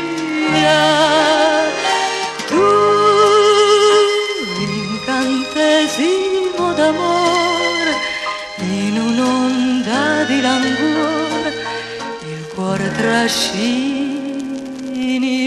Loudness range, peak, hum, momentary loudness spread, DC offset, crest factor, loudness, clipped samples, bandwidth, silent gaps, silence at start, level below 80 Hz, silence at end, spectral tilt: 6 LU; 0 dBFS; none; 12 LU; under 0.1%; 16 dB; -15 LUFS; under 0.1%; 13 kHz; none; 0 s; -52 dBFS; 0 s; -3.5 dB/octave